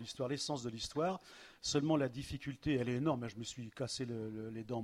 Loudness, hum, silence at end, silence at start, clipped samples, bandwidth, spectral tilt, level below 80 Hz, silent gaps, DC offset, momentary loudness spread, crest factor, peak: -39 LUFS; none; 0 s; 0 s; under 0.1%; 14.5 kHz; -5 dB/octave; -62 dBFS; none; under 0.1%; 10 LU; 20 dB; -20 dBFS